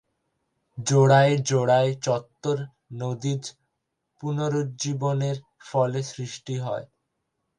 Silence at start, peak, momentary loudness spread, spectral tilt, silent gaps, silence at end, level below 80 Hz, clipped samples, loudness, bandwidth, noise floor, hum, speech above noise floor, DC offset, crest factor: 0.75 s; -4 dBFS; 16 LU; -5.5 dB/octave; none; 0.75 s; -66 dBFS; under 0.1%; -25 LUFS; 10 kHz; -79 dBFS; none; 55 dB; under 0.1%; 20 dB